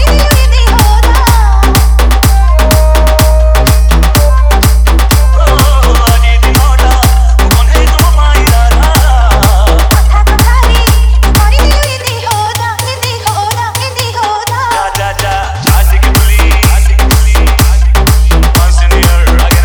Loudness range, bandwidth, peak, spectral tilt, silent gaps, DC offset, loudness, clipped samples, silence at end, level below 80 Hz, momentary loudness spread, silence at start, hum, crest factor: 4 LU; over 20 kHz; 0 dBFS; -4.5 dB/octave; none; under 0.1%; -8 LUFS; 0.3%; 0 s; -6 dBFS; 5 LU; 0 s; none; 6 dB